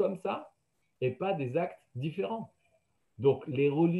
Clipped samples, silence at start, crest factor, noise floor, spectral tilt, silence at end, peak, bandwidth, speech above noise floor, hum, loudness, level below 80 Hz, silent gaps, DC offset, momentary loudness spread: under 0.1%; 0 s; 18 dB; -78 dBFS; -9 dB/octave; 0 s; -14 dBFS; 11 kHz; 47 dB; none; -33 LUFS; -74 dBFS; none; under 0.1%; 10 LU